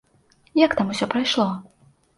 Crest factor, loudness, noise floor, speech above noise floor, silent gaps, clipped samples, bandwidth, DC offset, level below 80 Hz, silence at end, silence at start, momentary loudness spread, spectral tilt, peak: 20 dB; -21 LUFS; -59 dBFS; 39 dB; none; under 0.1%; 11.5 kHz; under 0.1%; -58 dBFS; 0.55 s; 0.55 s; 7 LU; -5 dB/octave; -2 dBFS